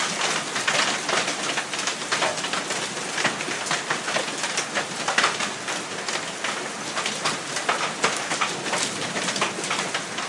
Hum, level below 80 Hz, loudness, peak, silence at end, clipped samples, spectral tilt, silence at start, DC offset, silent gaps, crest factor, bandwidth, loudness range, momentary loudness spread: none; -70 dBFS; -24 LUFS; -6 dBFS; 0 s; under 0.1%; -1 dB/octave; 0 s; under 0.1%; none; 22 dB; 12 kHz; 1 LU; 6 LU